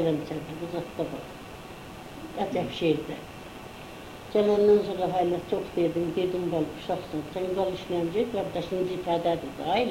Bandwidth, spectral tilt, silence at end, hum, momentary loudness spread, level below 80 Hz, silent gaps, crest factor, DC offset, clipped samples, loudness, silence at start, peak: 16 kHz; -6.5 dB/octave; 0 s; none; 18 LU; -54 dBFS; none; 16 dB; under 0.1%; under 0.1%; -28 LUFS; 0 s; -12 dBFS